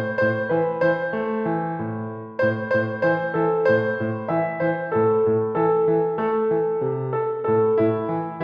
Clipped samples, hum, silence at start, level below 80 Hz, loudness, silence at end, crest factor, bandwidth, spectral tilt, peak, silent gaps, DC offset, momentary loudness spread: under 0.1%; none; 0 s; -64 dBFS; -22 LUFS; 0 s; 14 dB; 5.2 kHz; -9.5 dB/octave; -8 dBFS; none; under 0.1%; 6 LU